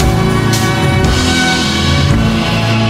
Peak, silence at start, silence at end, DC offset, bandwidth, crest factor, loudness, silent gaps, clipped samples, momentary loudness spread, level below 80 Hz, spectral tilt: 0 dBFS; 0 s; 0 s; under 0.1%; 16 kHz; 10 dB; -11 LUFS; none; under 0.1%; 2 LU; -22 dBFS; -5 dB/octave